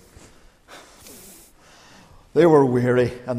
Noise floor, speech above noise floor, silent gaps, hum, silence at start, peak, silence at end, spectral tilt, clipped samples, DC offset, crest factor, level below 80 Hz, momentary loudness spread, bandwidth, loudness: -50 dBFS; 33 dB; none; none; 0.75 s; -4 dBFS; 0 s; -7.5 dB/octave; under 0.1%; under 0.1%; 18 dB; -54 dBFS; 25 LU; 15.5 kHz; -18 LUFS